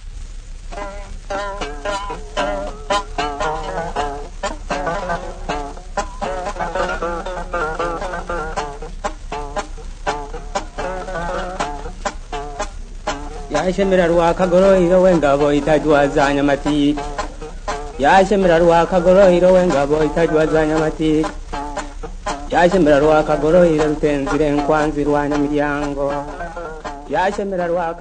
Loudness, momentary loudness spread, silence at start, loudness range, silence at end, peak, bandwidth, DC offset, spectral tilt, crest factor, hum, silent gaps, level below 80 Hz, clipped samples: -18 LUFS; 16 LU; 0 s; 12 LU; 0 s; 0 dBFS; 9.6 kHz; under 0.1%; -6 dB/octave; 18 dB; none; none; -30 dBFS; under 0.1%